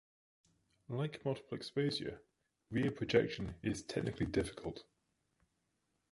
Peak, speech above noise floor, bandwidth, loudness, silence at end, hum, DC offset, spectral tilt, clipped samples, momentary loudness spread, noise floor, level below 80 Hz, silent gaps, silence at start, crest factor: -16 dBFS; 45 dB; 11.5 kHz; -39 LUFS; 1.3 s; none; under 0.1%; -6 dB/octave; under 0.1%; 13 LU; -83 dBFS; -60 dBFS; none; 0.9 s; 24 dB